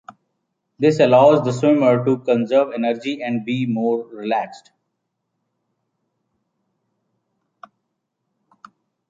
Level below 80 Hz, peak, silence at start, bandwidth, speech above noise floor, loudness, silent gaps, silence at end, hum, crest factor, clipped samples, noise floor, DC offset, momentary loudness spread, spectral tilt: -68 dBFS; -2 dBFS; 0.8 s; 7.8 kHz; 59 dB; -18 LUFS; none; 4.5 s; none; 18 dB; under 0.1%; -76 dBFS; under 0.1%; 11 LU; -7 dB/octave